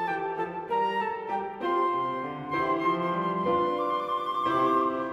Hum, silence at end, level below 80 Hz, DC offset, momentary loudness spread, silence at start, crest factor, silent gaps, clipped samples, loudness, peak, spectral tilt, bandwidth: none; 0 s; -66 dBFS; under 0.1%; 7 LU; 0 s; 14 dB; none; under 0.1%; -28 LUFS; -14 dBFS; -7 dB/octave; 12.5 kHz